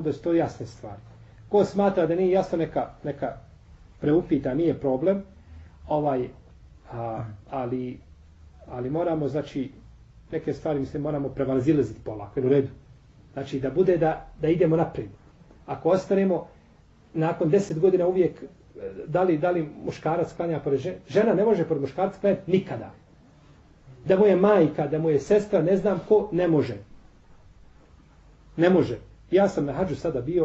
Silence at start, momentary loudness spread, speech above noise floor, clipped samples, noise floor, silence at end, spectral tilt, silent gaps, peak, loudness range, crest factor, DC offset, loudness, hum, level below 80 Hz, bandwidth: 0 s; 16 LU; 31 dB; under 0.1%; -55 dBFS; 0 s; -8 dB/octave; none; -8 dBFS; 8 LU; 18 dB; under 0.1%; -25 LUFS; none; -52 dBFS; 8 kHz